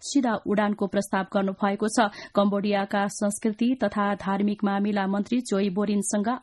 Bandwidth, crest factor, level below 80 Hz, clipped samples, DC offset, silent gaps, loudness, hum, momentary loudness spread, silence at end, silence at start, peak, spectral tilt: 12 kHz; 16 dB; -62 dBFS; under 0.1%; under 0.1%; none; -25 LUFS; none; 3 LU; 0.05 s; 0 s; -8 dBFS; -5 dB/octave